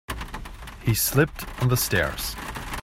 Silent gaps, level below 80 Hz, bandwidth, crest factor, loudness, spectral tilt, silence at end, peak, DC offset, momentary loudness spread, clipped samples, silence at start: none; -38 dBFS; 16 kHz; 20 dB; -25 LUFS; -4 dB/octave; 0 s; -6 dBFS; under 0.1%; 15 LU; under 0.1%; 0.1 s